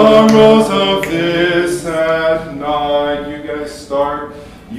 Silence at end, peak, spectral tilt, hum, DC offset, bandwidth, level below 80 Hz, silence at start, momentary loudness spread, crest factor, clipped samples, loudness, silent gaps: 0 s; 0 dBFS; -5 dB/octave; none; under 0.1%; 15 kHz; -42 dBFS; 0 s; 16 LU; 12 dB; 0.6%; -13 LUFS; none